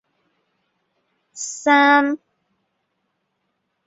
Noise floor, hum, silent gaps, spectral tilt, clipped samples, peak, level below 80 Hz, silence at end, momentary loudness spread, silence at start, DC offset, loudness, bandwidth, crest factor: -73 dBFS; none; none; -1 dB/octave; under 0.1%; -4 dBFS; -76 dBFS; 1.7 s; 18 LU; 1.35 s; under 0.1%; -16 LUFS; 8 kHz; 20 dB